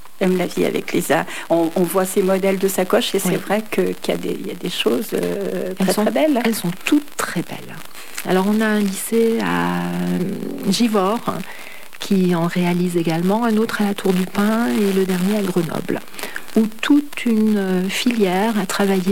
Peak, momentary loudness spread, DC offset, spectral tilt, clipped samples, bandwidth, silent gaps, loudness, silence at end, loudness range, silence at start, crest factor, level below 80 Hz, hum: -6 dBFS; 8 LU; 2%; -5.5 dB/octave; under 0.1%; 17 kHz; none; -19 LUFS; 0 s; 2 LU; 0.2 s; 14 dB; -60 dBFS; none